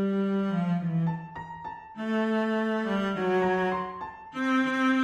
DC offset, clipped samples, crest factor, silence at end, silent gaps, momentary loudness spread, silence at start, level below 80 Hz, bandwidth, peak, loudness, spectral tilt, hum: under 0.1%; under 0.1%; 14 dB; 0 s; none; 14 LU; 0 s; -62 dBFS; 10 kHz; -14 dBFS; -28 LUFS; -7.5 dB/octave; none